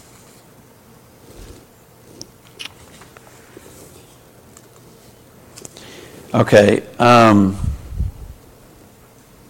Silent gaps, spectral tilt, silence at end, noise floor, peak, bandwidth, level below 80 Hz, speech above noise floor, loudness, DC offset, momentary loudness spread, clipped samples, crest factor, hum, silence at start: none; -6 dB/octave; 1.2 s; -47 dBFS; 0 dBFS; 17 kHz; -38 dBFS; 35 dB; -14 LUFS; under 0.1%; 28 LU; under 0.1%; 20 dB; none; 2.6 s